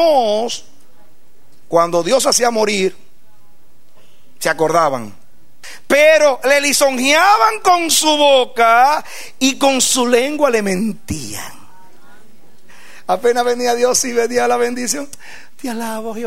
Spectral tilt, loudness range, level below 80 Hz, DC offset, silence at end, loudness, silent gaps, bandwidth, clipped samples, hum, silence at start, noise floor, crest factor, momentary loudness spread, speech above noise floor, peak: -2 dB/octave; 8 LU; -52 dBFS; 3%; 0 s; -14 LUFS; none; 16 kHz; under 0.1%; none; 0 s; -55 dBFS; 16 dB; 15 LU; 41 dB; 0 dBFS